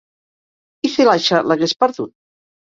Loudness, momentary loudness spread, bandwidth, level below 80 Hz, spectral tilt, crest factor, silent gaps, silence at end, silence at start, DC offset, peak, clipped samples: -16 LUFS; 13 LU; 7.8 kHz; -62 dBFS; -4.5 dB/octave; 16 dB; none; 0.6 s; 0.85 s; under 0.1%; -2 dBFS; under 0.1%